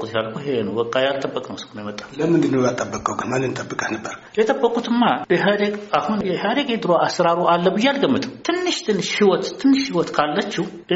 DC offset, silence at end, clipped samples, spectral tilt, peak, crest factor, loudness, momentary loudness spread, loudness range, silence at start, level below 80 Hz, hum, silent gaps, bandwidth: under 0.1%; 0 s; under 0.1%; -3.5 dB/octave; -4 dBFS; 16 dB; -20 LUFS; 8 LU; 3 LU; 0 s; -58 dBFS; none; none; 8 kHz